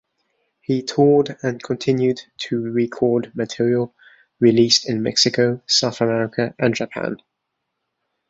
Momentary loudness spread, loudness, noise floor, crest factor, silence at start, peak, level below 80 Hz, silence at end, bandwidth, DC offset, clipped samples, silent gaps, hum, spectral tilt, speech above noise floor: 11 LU; -19 LUFS; -77 dBFS; 20 dB; 0.7 s; -2 dBFS; -60 dBFS; 1.15 s; 8 kHz; under 0.1%; under 0.1%; none; none; -4.5 dB/octave; 58 dB